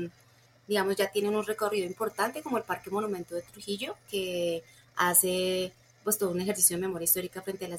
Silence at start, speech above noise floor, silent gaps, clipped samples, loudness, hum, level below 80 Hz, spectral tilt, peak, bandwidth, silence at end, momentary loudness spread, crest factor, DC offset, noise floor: 0 s; 31 dB; none; under 0.1%; -29 LUFS; none; -68 dBFS; -2.5 dB/octave; -10 dBFS; 16.5 kHz; 0 s; 14 LU; 22 dB; under 0.1%; -61 dBFS